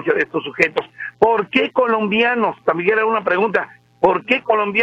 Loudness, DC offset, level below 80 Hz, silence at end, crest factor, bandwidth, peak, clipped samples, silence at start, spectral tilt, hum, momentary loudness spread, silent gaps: -17 LUFS; under 0.1%; -58 dBFS; 0 s; 18 dB; 7.8 kHz; 0 dBFS; under 0.1%; 0 s; -6 dB/octave; none; 5 LU; none